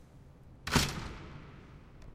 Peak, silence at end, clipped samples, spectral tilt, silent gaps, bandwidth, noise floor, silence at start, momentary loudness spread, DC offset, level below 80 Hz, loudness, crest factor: -12 dBFS; 0 s; under 0.1%; -3.5 dB/octave; none; 16 kHz; -55 dBFS; 0 s; 24 LU; under 0.1%; -48 dBFS; -33 LUFS; 26 dB